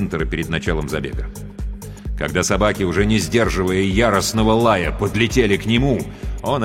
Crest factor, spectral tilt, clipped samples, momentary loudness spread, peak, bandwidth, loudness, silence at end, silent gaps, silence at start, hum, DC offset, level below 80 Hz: 16 dB; -5 dB/octave; under 0.1%; 14 LU; -2 dBFS; 16.5 kHz; -18 LUFS; 0 s; none; 0 s; none; under 0.1%; -28 dBFS